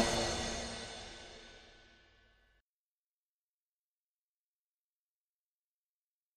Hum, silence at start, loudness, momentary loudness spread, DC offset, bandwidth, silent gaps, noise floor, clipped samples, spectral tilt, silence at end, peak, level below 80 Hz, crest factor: none; 0 s; -39 LUFS; 24 LU; under 0.1%; 13 kHz; none; under -90 dBFS; under 0.1%; -2.5 dB/octave; 4.45 s; -16 dBFS; -56 dBFS; 28 dB